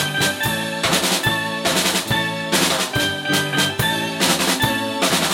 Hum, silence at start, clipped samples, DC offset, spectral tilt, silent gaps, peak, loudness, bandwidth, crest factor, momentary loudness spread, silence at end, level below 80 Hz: none; 0 s; under 0.1%; under 0.1%; -2.5 dB/octave; none; -4 dBFS; -18 LUFS; 17 kHz; 16 dB; 3 LU; 0 s; -46 dBFS